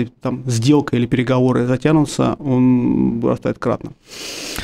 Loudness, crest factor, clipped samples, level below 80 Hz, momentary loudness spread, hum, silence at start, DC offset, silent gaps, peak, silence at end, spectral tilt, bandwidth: -17 LUFS; 14 dB; under 0.1%; -44 dBFS; 11 LU; none; 0 s; under 0.1%; none; -2 dBFS; 0 s; -6.5 dB/octave; 15.5 kHz